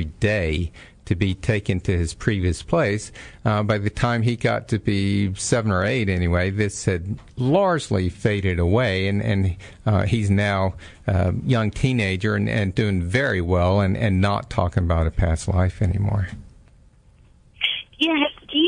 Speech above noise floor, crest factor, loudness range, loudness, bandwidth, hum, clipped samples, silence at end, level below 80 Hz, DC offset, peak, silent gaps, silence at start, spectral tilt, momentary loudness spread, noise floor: 31 dB; 16 dB; 3 LU; -22 LUFS; 10.5 kHz; none; under 0.1%; 0 s; -38 dBFS; under 0.1%; -4 dBFS; none; 0 s; -6 dB/octave; 5 LU; -52 dBFS